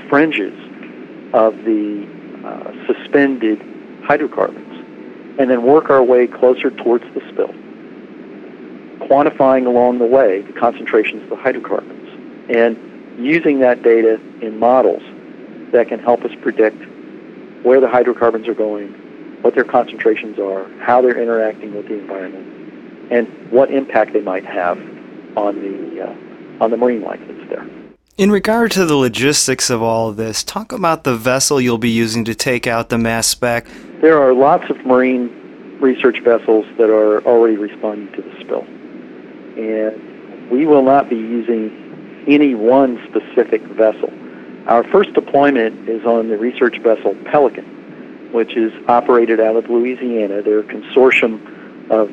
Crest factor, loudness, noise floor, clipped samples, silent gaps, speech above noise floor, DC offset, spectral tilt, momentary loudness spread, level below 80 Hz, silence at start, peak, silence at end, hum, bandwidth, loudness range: 16 dB; -15 LUFS; -35 dBFS; under 0.1%; none; 20 dB; under 0.1%; -4.5 dB/octave; 22 LU; -54 dBFS; 0 s; 0 dBFS; 0 s; none; 16 kHz; 4 LU